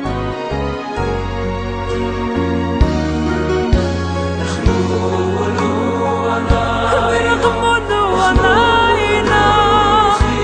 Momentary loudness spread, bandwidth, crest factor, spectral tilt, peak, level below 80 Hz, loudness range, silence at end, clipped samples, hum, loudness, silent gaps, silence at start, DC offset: 10 LU; 10 kHz; 14 dB; -5.5 dB/octave; 0 dBFS; -24 dBFS; 6 LU; 0 s; under 0.1%; none; -15 LUFS; none; 0 s; under 0.1%